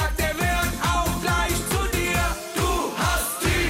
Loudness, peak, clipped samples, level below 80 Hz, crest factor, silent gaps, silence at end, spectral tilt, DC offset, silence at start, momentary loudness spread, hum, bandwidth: -23 LUFS; -12 dBFS; under 0.1%; -30 dBFS; 12 dB; none; 0 s; -3.5 dB/octave; under 0.1%; 0 s; 2 LU; none; 17 kHz